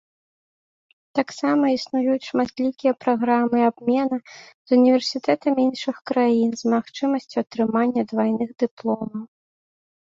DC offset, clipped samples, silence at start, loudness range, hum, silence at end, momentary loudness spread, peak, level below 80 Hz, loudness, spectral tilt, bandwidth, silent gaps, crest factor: under 0.1%; under 0.1%; 1.15 s; 3 LU; none; 0.9 s; 8 LU; -4 dBFS; -66 dBFS; -22 LUFS; -5.5 dB/octave; 7.6 kHz; 4.54-4.65 s, 8.71-8.77 s; 18 dB